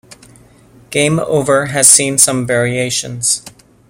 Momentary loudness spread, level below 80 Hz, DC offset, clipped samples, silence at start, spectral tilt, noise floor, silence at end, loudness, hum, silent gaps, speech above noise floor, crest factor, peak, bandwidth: 10 LU; -50 dBFS; under 0.1%; 0.3%; 0.1 s; -2.5 dB/octave; -44 dBFS; 0.4 s; -12 LUFS; none; none; 31 dB; 14 dB; 0 dBFS; over 20 kHz